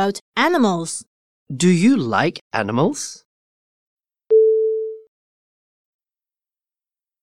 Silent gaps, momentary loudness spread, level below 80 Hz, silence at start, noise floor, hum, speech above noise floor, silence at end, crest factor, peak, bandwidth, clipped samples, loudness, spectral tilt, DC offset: 0.21-0.32 s, 1.07-1.46 s, 2.41-2.51 s, 3.25-3.97 s; 14 LU; -68 dBFS; 0 s; under -90 dBFS; none; over 72 dB; 2.25 s; 18 dB; -2 dBFS; 13 kHz; under 0.1%; -18 LUFS; -5.5 dB/octave; under 0.1%